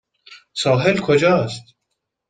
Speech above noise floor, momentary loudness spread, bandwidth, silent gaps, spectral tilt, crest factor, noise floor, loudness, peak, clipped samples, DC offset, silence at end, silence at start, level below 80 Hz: 60 dB; 15 LU; 9.4 kHz; none; -5.5 dB/octave; 18 dB; -77 dBFS; -17 LUFS; -2 dBFS; under 0.1%; under 0.1%; 0.7 s; 0.3 s; -56 dBFS